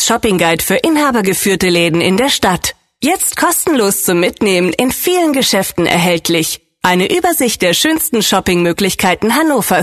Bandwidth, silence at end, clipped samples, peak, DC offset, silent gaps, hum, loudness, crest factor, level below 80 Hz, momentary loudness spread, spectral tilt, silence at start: 14.5 kHz; 0 s; under 0.1%; 0 dBFS; under 0.1%; none; none; -12 LUFS; 12 dB; -42 dBFS; 3 LU; -3.5 dB/octave; 0 s